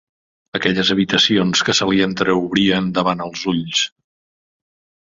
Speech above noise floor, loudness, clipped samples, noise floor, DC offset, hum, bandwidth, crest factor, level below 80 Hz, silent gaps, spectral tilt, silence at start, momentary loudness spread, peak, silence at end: over 73 dB; -17 LUFS; under 0.1%; under -90 dBFS; under 0.1%; none; 7.8 kHz; 16 dB; -52 dBFS; none; -4 dB/octave; 0.55 s; 8 LU; -2 dBFS; 1.15 s